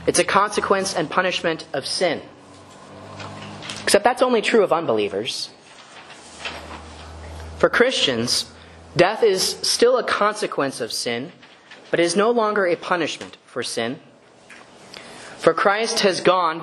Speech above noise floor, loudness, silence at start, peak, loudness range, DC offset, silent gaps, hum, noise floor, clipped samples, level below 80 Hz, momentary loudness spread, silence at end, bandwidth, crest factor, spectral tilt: 27 dB; -20 LUFS; 0 s; 0 dBFS; 5 LU; under 0.1%; none; none; -47 dBFS; under 0.1%; -52 dBFS; 20 LU; 0 s; 12.5 kHz; 22 dB; -3 dB/octave